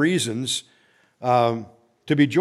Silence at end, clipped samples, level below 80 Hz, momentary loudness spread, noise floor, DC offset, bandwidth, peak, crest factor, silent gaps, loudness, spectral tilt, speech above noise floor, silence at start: 0 s; under 0.1%; -70 dBFS; 9 LU; -60 dBFS; under 0.1%; 14 kHz; -4 dBFS; 18 dB; none; -23 LUFS; -5 dB/octave; 39 dB; 0 s